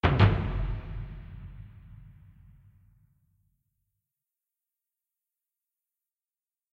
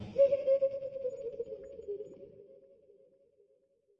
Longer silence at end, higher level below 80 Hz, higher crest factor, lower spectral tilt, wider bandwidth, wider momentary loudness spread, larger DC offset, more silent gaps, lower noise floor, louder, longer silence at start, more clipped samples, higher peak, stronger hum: first, 4.65 s vs 1.45 s; first, -40 dBFS vs -72 dBFS; first, 26 dB vs 18 dB; about the same, -8.5 dB/octave vs -7.5 dB/octave; about the same, 5.6 kHz vs 5.8 kHz; first, 28 LU vs 20 LU; neither; neither; first, under -90 dBFS vs -71 dBFS; first, -28 LUFS vs -34 LUFS; about the same, 0.05 s vs 0 s; neither; first, -8 dBFS vs -16 dBFS; neither